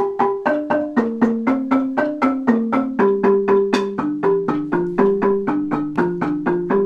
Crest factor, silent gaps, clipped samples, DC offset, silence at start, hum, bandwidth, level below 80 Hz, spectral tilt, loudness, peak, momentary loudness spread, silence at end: 16 dB; none; under 0.1%; under 0.1%; 0 s; none; 8.4 kHz; -54 dBFS; -7.5 dB/octave; -19 LUFS; -2 dBFS; 4 LU; 0 s